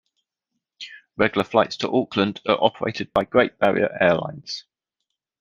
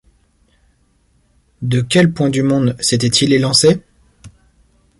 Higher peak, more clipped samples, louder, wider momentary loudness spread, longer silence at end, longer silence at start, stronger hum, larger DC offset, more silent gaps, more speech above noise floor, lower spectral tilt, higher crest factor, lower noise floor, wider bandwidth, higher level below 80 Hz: about the same, -2 dBFS vs 0 dBFS; neither; second, -21 LUFS vs -14 LUFS; first, 14 LU vs 8 LU; about the same, 0.8 s vs 0.7 s; second, 0.8 s vs 1.6 s; neither; neither; neither; first, 60 dB vs 44 dB; about the same, -5.5 dB/octave vs -4.5 dB/octave; first, 22 dB vs 16 dB; first, -81 dBFS vs -57 dBFS; second, 9.6 kHz vs 11.5 kHz; second, -58 dBFS vs -48 dBFS